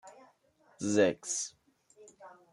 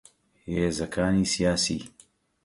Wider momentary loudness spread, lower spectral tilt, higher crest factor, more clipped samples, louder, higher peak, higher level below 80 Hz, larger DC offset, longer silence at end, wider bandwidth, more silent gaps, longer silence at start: first, 25 LU vs 14 LU; about the same, -3.5 dB/octave vs -4.5 dB/octave; first, 22 dB vs 16 dB; neither; second, -31 LUFS vs -26 LUFS; about the same, -14 dBFS vs -12 dBFS; second, -78 dBFS vs -46 dBFS; neither; second, 0.2 s vs 0.55 s; about the same, 12 kHz vs 11.5 kHz; neither; second, 0.05 s vs 0.45 s